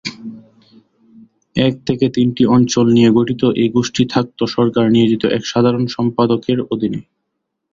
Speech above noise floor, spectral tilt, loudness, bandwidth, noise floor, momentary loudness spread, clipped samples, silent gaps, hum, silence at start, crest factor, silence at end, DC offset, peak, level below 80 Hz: 60 dB; -6 dB/octave; -15 LUFS; 7.6 kHz; -74 dBFS; 8 LU; under 0.1%; none; none; 0.05 s; 16 dB; 0.75 s; under 0.1%; 0 dBFS; -50 dBFS